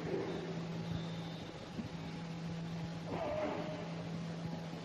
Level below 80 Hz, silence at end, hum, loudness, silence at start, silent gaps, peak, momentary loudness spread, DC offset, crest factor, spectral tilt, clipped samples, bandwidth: -64 dBFS; 0 s; none; -42 LUFS; 0 s; none; -26 dBFS; 6 LU; under 0.1%; 16 dB; -6.5 dB/octave; under 0.1%; 8.8 kHz